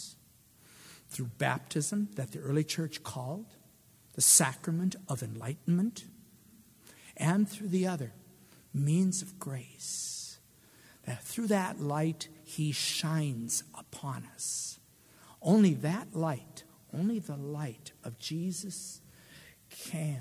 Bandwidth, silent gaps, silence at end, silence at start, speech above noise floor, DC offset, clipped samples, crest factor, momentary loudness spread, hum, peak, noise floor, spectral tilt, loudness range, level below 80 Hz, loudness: 16 kHz; none; 0 s; 0 s; 29 dB; under 0.1%; under 0.1%; 24 dB; 18 LU; none; -10 dBFS; -62 dBFS; -4.5 dB/octave; 7 LU; -72 dBFS; -32 LUFS